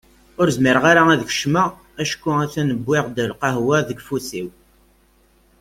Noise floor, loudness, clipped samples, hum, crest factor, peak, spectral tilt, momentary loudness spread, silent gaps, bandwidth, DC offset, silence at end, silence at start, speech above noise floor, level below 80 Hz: -56 dBFS; -19 LUFS; under 0.1%; none; 18 dB; -2 dBFS; -5 dB/octave; 13 LU; none; 16.5 kHz; under 0.1%; 1.1 s; 0.4 s; 38 dB; -52 dBFS